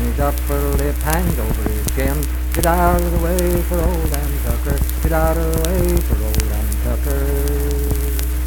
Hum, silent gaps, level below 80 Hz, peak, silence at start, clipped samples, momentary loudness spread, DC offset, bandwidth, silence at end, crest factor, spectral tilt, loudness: none; none; -18 dBFS; 0 dBFS; 0 s; under 0.1%; 4 LU; under 0.1%; 19.5 kHz; 0 s; 16 dB; -5.5 dB/octave; -19 LUFS